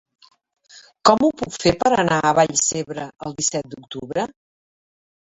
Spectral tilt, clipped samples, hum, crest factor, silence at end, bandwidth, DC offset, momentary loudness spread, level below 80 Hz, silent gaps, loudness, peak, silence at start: -3.5 dB/octave; under 0.1%; none; 20 dB; 0.95 s; 8.4 kHz; under 0.1%; 14 LU; -50 dBFS; none; -19 LUFS; 0 dBFS; 0.75 s